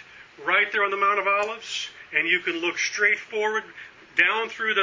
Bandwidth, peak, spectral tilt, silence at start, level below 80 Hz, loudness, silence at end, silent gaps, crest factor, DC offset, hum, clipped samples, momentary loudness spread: 7.6 kHz; -4 dBFS; -1 dB/octave; 0.1 s; -70 dBFS; -23 LUFS; 0 s; none; 20 dB; under 0.1%; none; under 0.1%; 10 LU